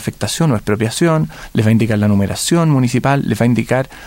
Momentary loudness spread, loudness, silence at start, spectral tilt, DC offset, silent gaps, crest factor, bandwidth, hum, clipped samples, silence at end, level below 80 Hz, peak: 4 LU; -15 LUFS; 0 s; -6 dB/octave; under 0.1%; none; 12 dB; 16.5 kHz; none; under 0.1%; 0 s; -42 dBFS; -2 dBFS